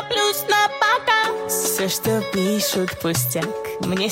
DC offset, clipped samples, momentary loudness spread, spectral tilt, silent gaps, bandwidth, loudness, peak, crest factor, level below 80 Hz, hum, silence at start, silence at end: under 0.1%; under 0.1%; 6 LU; -3 dB/octave; none; 16.5 kHz; -20 LUFS; -6 dBFS; 14 dB; -56 dBFS; none; 0 s; 0 s